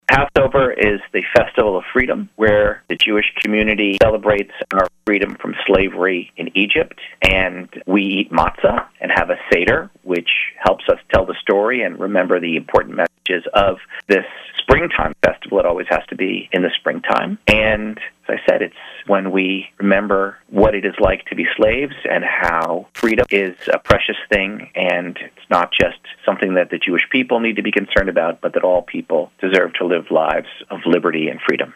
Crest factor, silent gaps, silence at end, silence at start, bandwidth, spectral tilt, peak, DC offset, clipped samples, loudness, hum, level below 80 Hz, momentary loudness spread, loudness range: 16 dB; none; 0.05 s; 0.1 s; 14 kHz; -6 dB/octave; 0 dBFS; under 0.1%; under 0.1%; -17 LUFS; none; -36 dBFS; 7 LU; 2 LU